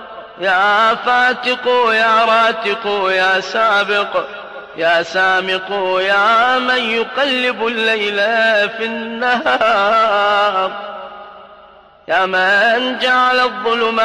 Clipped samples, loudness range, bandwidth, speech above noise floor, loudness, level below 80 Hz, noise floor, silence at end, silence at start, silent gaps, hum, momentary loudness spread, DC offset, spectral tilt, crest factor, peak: under 0.1%; 2 LU; 11.5 kHz; 28 dB; -14 LUFS; -58 dBFS; -43 dBFS; 0 s; 0 s; none; none; 9 LU; 0.1%; -3 dB/octave; 10 dB; -4 dBFS